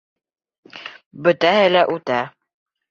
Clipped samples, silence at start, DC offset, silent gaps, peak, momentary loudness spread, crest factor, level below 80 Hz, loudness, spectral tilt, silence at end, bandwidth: under 0.1%; 0.75 s; under 0.1%; 1.06-1.11 s; -2 dBFS; 21 LU; 18 dB; -66 dBFS; -17 LUFS; -5.5 dB/octave; 0.6 s; 7.4 kHz